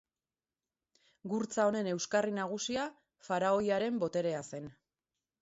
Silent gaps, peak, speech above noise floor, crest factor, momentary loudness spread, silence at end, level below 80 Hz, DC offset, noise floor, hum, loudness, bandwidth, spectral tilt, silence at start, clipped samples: none; -18 dBFS; over 57 dB; 18 dB; 13 LU; 0.7 s; -74 dBFS; under 0.1%; under -90 dBFS; none; -34 LUFS; 8 kHz; -4 dB/octave; 1.25 s; under 0.1%